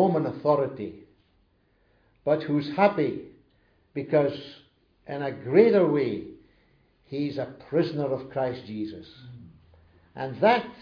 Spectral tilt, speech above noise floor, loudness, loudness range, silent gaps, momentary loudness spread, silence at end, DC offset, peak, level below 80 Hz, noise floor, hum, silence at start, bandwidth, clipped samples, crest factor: -9 dB/octave; 41 dB; -26 LUFS; 6 LU; none; 17 LU; 0 s; under 0.1%; -6 dBFS; -66 dBFS; -66 dBFS; none; 0 s; 5.4 kHz; under 0.1%; 22 dB